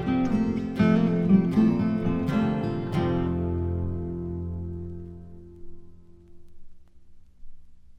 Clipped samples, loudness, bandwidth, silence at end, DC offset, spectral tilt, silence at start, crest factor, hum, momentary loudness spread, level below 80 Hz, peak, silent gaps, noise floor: under 0.1%; -25 LUFS; 7 kHz; 0 s; under 0.1%; -9 dB/octave; 0 s; 18 dB; none; 16 LU; -44 dBFS; -8 dBFS; none; -47 dBFS